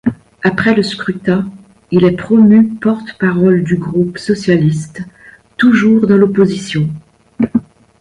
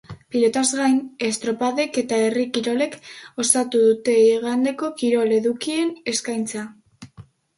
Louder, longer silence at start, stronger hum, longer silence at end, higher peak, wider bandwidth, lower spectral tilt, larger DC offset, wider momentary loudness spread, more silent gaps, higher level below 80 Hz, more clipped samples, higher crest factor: first, -13 LUFS vs -21 LUFS; about the same, 0.05 s vs 0.1 s; neither; about the same, 0.4 s vs 0.35 s; about the same, 0 dBFS vs -2 dBFS; about the same, 10.5 kHz vs 11.5 kHz; first, -7.5 dB/octave vs -3 dB/octave; neither; about the same, 11 LU vs 10 LU; neither; first, -46 dBFS vs -64 dBFS; neither; second, 12 dB vs 20 dB